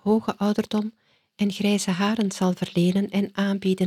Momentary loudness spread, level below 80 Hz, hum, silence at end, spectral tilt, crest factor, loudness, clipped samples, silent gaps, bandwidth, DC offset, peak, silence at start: 5 LU; -64 dBFS; none; 0 s; -6 dB/octave; 14 dB; -24 LUFS; under 0.1%; none; 14 kHz; under 0.1%; -10 dBFS; 0.05 s